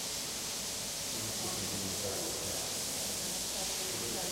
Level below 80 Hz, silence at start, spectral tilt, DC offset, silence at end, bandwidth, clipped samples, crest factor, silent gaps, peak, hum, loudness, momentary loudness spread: -60 dBFS; 0 s; -1.5 dB/octave; under 0.1%; 0 s; 16 kHz; under 0.1%; 14 dB; none; -24 dBFS; none; -34 LUFS; 2 LU